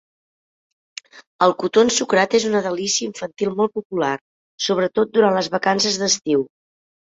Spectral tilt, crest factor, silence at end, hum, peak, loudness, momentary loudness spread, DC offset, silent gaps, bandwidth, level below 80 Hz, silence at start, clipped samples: -3 dB/octave; 20 dB; 0.7 s; none; -2 dBFS; -19 LUFS; 13 LU; under 0.1%; 1.27-1.39 s, 3.85-3.90 s, 4.21-4.58 s; 8 kHz; -62 dBFS; 1.15 s; under 0.1%